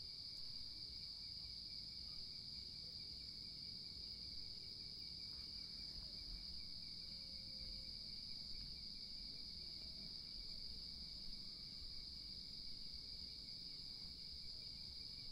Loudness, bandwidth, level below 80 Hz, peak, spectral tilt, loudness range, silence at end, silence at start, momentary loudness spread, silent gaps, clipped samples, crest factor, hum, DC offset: -50 LUFS; 16 kHz; -64 dBFS; -38 dBFS; -3 dB/octave; 1 LU; 0 s; 0 s; 1 LU; none; under 0.1%; 14 dB; none; under 0.1%